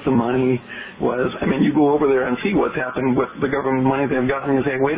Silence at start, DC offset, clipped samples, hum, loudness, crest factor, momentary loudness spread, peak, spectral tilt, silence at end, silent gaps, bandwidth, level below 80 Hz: 0 s; under 0.1%; under 0.1%; none; -19 LUFS; 14 dB; 5 LU; -4 dBFS; -11 dB/octave; 0 s; none; 4 kHz; -48 dBFS